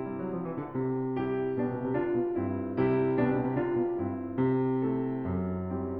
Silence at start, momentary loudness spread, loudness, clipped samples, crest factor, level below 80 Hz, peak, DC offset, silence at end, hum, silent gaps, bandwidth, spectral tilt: 0 s; 6 LU; -30 LUFS; under 0.1%; 14 dB; -58 dBFS; -14 dBFS; 0.1%; 0 s; none; none; 4.3 kHz; -12 dB/octave